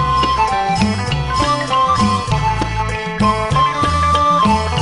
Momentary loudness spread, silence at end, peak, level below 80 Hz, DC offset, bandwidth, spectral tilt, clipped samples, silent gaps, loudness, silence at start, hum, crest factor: 6 LU; 0 s; -2 dBFS; -28 dBFS; 0.4%; 11 kHz; -5 dB/octave; under 0.1%; none; -15 LUFS; 0 s; none; 14 dB